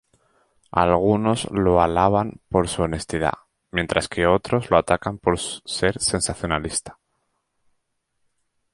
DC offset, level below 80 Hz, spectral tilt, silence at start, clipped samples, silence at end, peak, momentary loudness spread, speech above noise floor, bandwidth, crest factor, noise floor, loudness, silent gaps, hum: under 0.1%; -42 dBFS; -4.5 dB/octave; 0.75 s; under 0.1%; 1.8 s; -2 dBFS; 8 LU; 52 dB; 11.5 kHz; 20 dB; -73 dBFS; -22 LUFS; none; none